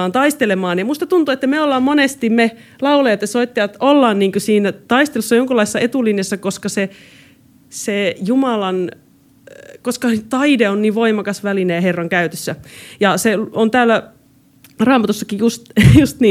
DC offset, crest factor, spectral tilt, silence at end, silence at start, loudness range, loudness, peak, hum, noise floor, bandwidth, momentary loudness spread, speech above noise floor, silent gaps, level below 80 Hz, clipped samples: under 0.1%; 16 dB; -5.5 dB/octave; 0 s; 0 s; 5 LU; -15 LUFS; 0 dBFS; none; -49 dBFS; 16 kHz; 8 LU; 34 dB; none; -40 dBFS; under 0.1%